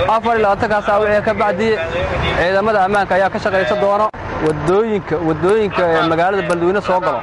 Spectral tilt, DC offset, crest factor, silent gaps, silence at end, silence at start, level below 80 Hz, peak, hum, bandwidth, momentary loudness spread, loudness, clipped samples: -6 dB/octave; under 0.1%; 10 dB; none; 0 s; 0 s; -36 dBFS; -4 dBFS; none; 11.5 kHz; 4 LU; -15 LUFS; under 0.1%